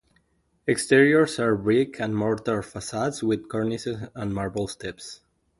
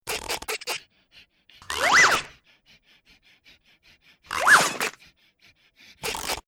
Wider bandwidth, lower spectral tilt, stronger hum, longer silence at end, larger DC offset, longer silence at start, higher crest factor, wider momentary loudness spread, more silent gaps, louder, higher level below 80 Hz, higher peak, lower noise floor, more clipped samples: second, 11.5 kHz vs over 20 kHz; first, -5.5 dB/octave vs -0.5 dB/octave; neither; first, 0.45 s vs 0.05 s; neither; first, 0.65 s vs 0.05 s; about the same, 20 dB vs 22 dB; about the same, 14 LU vs 16 LU; neither; about the same, -24 LUFS vs -22 LUFS; about the same, -54 dBFS vs -56 dBFS; about the same, -4 dBFS vs -4 dBFS; first, -68 dBFS vs -60 dBFS; neither